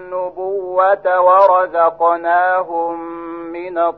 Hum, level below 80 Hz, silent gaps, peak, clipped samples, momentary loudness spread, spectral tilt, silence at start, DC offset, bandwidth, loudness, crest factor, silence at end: none; -60 dBFS; none; 0 dBFS; under 0.1%; 16 LU; -7 dB/octave; 0 s; 0.1%; 4.8 kHz; -15 LUFS; 14 dB; 0 s